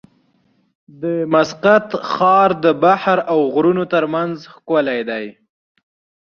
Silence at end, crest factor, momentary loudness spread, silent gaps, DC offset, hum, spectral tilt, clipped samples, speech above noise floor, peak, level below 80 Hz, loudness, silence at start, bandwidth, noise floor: 0.9 s; 16 dB; 12 LU; none; under 0.1%; none; -6.5 dB/octave; under 0.1%; 45 dB; -2 dBFS; -62 dBFS; -16 LUFS; 1 s; 7 kHz; -60 dBFS